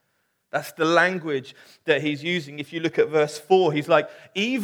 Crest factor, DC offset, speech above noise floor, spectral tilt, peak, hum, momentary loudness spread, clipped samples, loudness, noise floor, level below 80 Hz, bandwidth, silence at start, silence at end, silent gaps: 20 dB; under 0.1%; 49 dB; -5 dB/octave; -4 dBFS; none; 11 LU; under 0.1%; -23 LUFS; -72 dBFS; -80 dBFS; 18.5 kHz; 0.55 s; 0 s; none